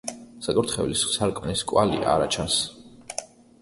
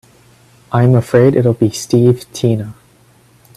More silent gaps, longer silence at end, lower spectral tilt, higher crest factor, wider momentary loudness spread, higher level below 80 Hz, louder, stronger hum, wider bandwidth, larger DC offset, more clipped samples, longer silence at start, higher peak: neither; second, 0.35 s vs 0.85 s; second, -3.5 dB/octave vs -7.5 dB/octave; first, 20 dB vs 14 dB; first, 13 LU vs 9 LU; about the same, -48 dBFS vs -50 dBFS; second, -24 LUFS vs -13 LUFS; neither; second, 12 kHz vs 13.5 kHz; neither; neither; second, 0.05 s vs 0.7 s; second, -6 dBFS vs 0 dBFS